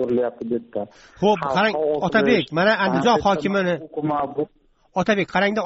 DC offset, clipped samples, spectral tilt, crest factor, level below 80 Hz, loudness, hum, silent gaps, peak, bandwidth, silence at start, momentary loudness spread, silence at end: under 0.1%; under 0.1%; -3.5 dB/octave; 16 dB; -54 dBFS; -21 LUFS; none; none; -4 dBFS; 8 kHz; 0 s; 11 LU; 0 s